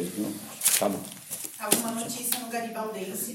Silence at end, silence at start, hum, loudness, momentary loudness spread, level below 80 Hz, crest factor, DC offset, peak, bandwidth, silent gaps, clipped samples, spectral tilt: 0 s; 0 s; none; -28 LUFS; 12 LU; -74 dBFS; 26 dB; under 0.1%; -4 dBFS; 17 kHz; none; under 0.1%; -2 dB/octave